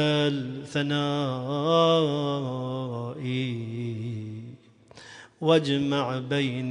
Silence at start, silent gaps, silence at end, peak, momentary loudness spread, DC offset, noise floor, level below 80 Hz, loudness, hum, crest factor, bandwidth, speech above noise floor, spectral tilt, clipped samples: 0 s; none; 0 s; -8 dBFS; 15 LU; under 0.1%; -51 dBFS; -66 dBFS; -27 LUFS; none; 20 dB; 10.5 kHz; 26 dB; -6.5 dB/octave; under 0.1%